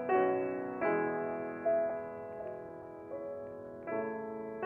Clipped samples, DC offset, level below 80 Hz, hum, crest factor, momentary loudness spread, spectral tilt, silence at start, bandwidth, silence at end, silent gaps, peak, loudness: under 0.1%; under 0.1%; -72 dBFS; none; 18 dB; 13 LU; -9 dB/octave; 0 s; 3.2 kHz; 0 s; none; -18 dBFS; -36 LUFS